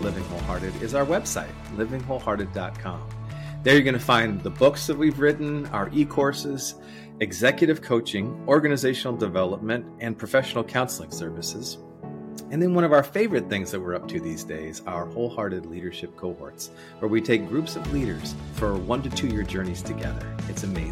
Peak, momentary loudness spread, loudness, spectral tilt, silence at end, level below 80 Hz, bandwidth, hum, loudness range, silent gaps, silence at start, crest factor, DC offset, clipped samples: -6 dBFS; 14 LU; -25 LUFS; -5 dB/octave; 0 s; -44 dBFS; 16.5 kHz; none; 6 LU; none; 0 s; 20 dB; under 0.1%; under 0.1%